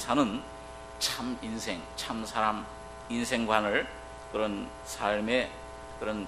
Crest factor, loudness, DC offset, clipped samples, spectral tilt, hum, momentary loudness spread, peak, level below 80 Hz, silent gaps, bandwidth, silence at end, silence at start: 24 dB; -31 LUFS; under 0.1%; under 0.1%; -3.5 dB/octave; none; 17 LU; -8 dBFS; -52 dBFS; none; 13 kHz; 0 s; 0 s